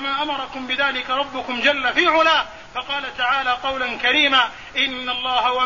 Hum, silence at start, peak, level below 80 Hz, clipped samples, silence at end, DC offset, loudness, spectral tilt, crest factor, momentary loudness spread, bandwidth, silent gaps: none; 0 s; -4 dBFS; -52 dBFS; under 0.1%; 0 s; 0.4%; -19 LUFS; -2 dB/octave; 16 dB; 10 LU; 7.4 kHz; none